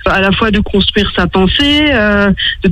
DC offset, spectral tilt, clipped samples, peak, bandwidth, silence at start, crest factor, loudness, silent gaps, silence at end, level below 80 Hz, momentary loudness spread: under 0.1%; -6 dB/octave; under 0.1%; 0 dBFS; 11 kHz; 0 s; 10 dB; -10 LUFS; none; 0 s; -24 dBFS; 3 LU